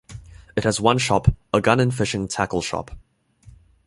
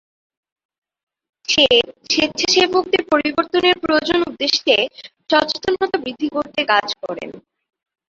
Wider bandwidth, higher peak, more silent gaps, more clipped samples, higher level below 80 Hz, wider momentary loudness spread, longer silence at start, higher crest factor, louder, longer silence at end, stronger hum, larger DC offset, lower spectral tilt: first, 11.5 kHz vs 7.6 kHz; about the same, -2 dBFS vs -2 dBFS; neither; neither; first, -38 dBFS vs -56 dBFS; first, 15 LU vs 12 LU; second, 0.1 s vs 1.5 s; about the same, 22 dB vs 18 dB; second, -21 LUFS vs -17 LUFS; second, 0.35 s vs 0.7 s; neither; neither; first, -5 dB/octave vs -2 dB/octave